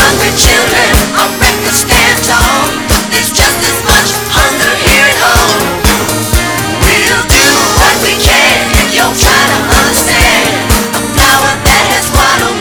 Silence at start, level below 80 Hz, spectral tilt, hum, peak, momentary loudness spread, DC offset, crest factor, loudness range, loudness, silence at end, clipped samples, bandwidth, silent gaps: 0 s; -18 dBFS; -2.5 dB/octave; none; 0 dBFS; 5 LU; under 0.1%; 8 dB; 1 LU; -7 LUFS; 0 s; 1%; over 20 kHz; none